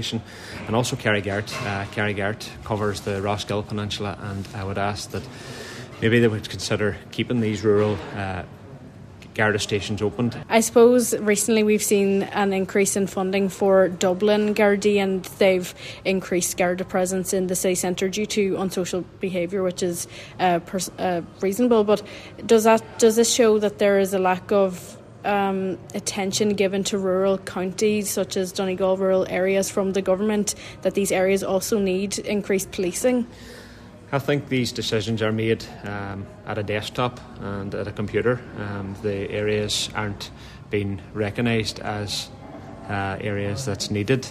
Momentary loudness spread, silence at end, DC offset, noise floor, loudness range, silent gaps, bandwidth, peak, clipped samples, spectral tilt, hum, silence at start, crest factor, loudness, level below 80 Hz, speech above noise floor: 13 LU; 0 s; under 0.1%; -43 dBFS; 7 LU; none; 14 kHz; -4 dBFS; under 0.1%; -4.5 dB/octave; none; 0 s; 20 dB; -23 LUFS; -52 dBFS; 21 dB